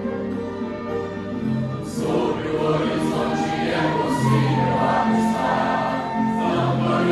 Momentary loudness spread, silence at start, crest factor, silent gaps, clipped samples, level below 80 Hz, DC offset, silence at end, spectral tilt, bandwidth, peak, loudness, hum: 8 LU; 0 s; 14 dB; none; under 0.1%; -50 dBFS; under 0.1%; 0 s; -6.5 dB/octave; 13 kHz; -8 dBFS; -22 LUFS; none